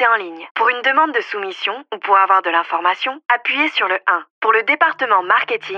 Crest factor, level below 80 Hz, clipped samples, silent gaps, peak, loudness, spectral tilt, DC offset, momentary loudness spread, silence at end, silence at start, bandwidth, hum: 16 dB; -80 dBFS; under 0.1%; 0.51-0.55 s, 4.30-4.41 s; -2 dBFS; -16 LUFS; -2.5 dB/octave; under 0.1%; 8 LU; 0 s; 0 s; 7.4 kHz; none